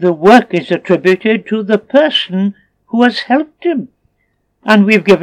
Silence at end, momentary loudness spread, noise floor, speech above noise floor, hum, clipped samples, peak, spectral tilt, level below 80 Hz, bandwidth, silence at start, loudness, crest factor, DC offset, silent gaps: 0 s; 10 LU; -63 dBFS; 52 dB; none; 0.5%; 0 dBFS; -6 dB/octave; -58 dBFS; 12.5 kHz; 0 s; -12 LUFS; 12 dB; under 0.1%; none